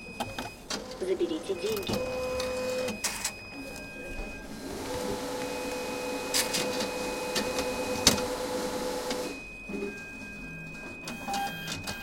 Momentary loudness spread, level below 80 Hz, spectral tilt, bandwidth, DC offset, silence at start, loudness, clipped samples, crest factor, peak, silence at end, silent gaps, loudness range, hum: 12 LU; -50 dBFS; -2.5 dB/octave; 16.5 kHz; under 0.1%; 0 s; -32 LUFS; under 0.1%; 32 dB; -2 dBFS; 0 s; none; 6 LU; none